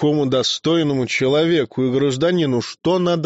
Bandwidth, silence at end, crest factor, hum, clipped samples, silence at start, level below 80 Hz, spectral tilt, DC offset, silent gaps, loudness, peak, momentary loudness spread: 8 kHz; 0 s; 10 dB; none; under 0.1%; 0 s; -56 dBFS; -5 dB/octave; under 0.1%; none; -18 LUFS; -8 dBFS; 3 LU